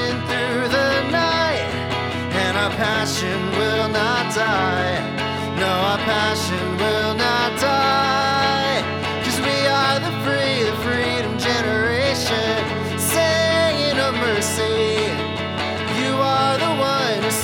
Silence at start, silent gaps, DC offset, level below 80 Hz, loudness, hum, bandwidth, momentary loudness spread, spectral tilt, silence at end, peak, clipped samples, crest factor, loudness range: 0 s; none; under 0.1%; -52 dBFS; -19 LUFS; none; 20 kHz; 5 LU; -4 dB/octave; 0 s; -6 dBFS; under 0.1%; 14 dB; 1 LU